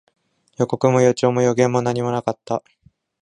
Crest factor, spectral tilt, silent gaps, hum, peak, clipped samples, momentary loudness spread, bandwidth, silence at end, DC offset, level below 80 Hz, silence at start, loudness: 18 dB; -6.5 dB/octave; none; none; -2 dBFS; under 0.1%; 10 LU; 10 kHz; 0.65 s; under 0.1%; -60 dBFS; 0.6 s; -19 LUFS